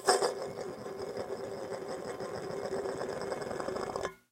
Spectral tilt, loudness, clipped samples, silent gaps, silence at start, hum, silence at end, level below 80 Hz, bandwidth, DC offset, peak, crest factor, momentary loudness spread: -3 dB/octave; -37 LUFS; under 0.1%; none; 0 s; none; 0.15 s; -66 dBFS; 16.5 kHz; under 0.1%; -8 dBFS; 28 dB; 6 LU